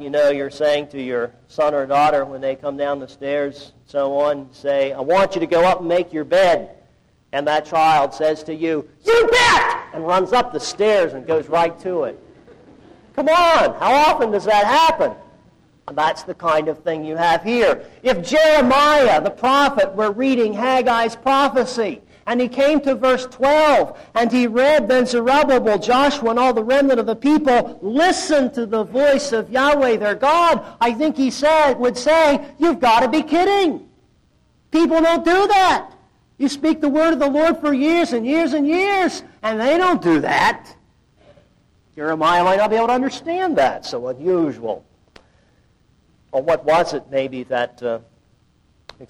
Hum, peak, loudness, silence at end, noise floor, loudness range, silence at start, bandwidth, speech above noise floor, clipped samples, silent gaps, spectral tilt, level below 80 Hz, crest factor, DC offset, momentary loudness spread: none; -8 dBFS; -17 LUFS; 0.05 s; -58 dBFS; 5 LU; 0 s; 14.5 kHz; 41 dB; under 0.1%; none; -4 dB/octave; -48 dBFS; 10 dB; under 0.1%; 10 LU